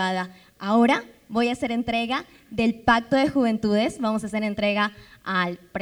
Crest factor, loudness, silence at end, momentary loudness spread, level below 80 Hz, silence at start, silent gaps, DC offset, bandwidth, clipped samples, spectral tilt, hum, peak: 18 dB; -24 LUFS; 0 s; 10 LU; -54 dBFS; 0 s; none; under 0.1%; 11.5 kHz; under 0.1%; -5.5 dB/octave; none; -6 dBFS